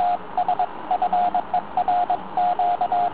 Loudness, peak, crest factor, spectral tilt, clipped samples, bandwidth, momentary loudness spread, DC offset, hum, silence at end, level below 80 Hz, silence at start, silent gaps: -23 LUFS; -10 dBFS; 12 dB; -8 dB/octave; under 0.1%; 4 kHz; 4 LU; 1%; none; 0 s; -58 dBFS; 0 s; none